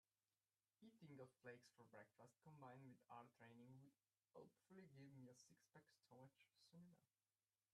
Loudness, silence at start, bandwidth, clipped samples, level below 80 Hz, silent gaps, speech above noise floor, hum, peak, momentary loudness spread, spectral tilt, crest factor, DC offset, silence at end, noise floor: -67 LUFS; 0.8 s; 11.5 kHz; under 0.1%; under -90 dBFS; none; over 22 dB; none; -48 dBFS; 5 LU; -6 dB/octave; 20 dB; under 0.1%; 0.65 s; under -90 dBFS